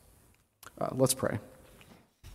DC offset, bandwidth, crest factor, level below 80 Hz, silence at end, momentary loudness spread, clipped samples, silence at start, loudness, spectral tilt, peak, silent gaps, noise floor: under 0.1%; 16 kHz; 22 dB; -62 dBFS; 0 s; 26 LU; under 0.1%; 0.65 s; -31 LUFS; -4.5 dB/octave; -14 dBFS; none; -64 dBFS